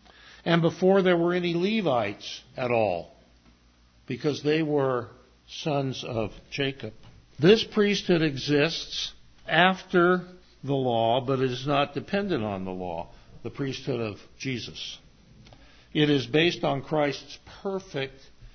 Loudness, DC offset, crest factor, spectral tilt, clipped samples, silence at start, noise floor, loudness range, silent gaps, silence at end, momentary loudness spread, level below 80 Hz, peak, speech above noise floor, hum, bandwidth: -26 LUFS; under 0.1%; 22 dB; -6 dB/octave; under 0.1%; 0.25 s; -59 dBFS; 6 LU; none; 0.05 s; 16 LU; -56 dBFS; -6 dBFS; 33 dB; none; 6.6 kHz